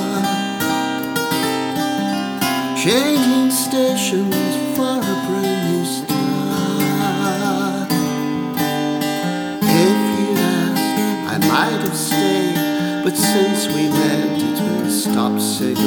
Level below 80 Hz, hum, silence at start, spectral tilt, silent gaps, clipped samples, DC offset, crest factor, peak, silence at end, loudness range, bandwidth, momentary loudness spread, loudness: -62 dBFS; none; 0 s; -4.5 dB/octave; none; under 0.1%; under 0.1%; 16 dB; -2 dBFS; 0 s; 2 LU; over 20 kHz; 5 LU; -18 LUFS